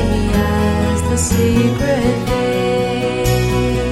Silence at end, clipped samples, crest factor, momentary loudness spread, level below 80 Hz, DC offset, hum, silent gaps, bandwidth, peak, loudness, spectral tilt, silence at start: 0 s; under 0.1%; 14 dB; 3 LU; -26 dBFS; under 0.1%; none; none; 16.5 kHz; -2 dBFS; -16 LUFS; -5.5 dB/octave; 0 s